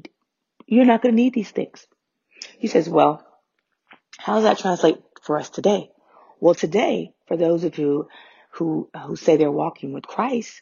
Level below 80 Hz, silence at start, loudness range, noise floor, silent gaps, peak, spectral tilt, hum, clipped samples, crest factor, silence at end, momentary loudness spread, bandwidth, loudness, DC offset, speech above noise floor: -70 dBFS; 0.7 s; 3 LU; -75 dBFS; none; -2 dBFS; -5 dB/octave; none; under 0.1%; 20 dB; 0.1 s; 14 LU; 7.4 kHz; -21 LUFS; under 0.1%; 55 dB